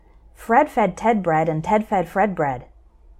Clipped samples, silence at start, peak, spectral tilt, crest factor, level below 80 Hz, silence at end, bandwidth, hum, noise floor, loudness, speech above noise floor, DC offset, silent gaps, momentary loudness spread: under 0.1%; 0.4 s; -4 dBFS; -7 dB/octave; 18 dB; -48 dBFS; 0.55 s; 15 kHz; none; -49 dBFS; -20 LUFS; 29 dB; under 0.1%; none; 7 LU